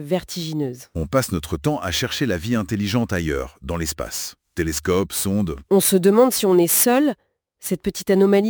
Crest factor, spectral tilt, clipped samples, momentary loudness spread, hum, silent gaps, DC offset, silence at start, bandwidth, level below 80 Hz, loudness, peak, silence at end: 16 dB; -4.5 dB/octave; under 0.1%; 12 LU; none; none; under 0.1%; 0 s; over 20 kHz; -40 dBFS; -20 LUFS; -4 dBFS; 0 s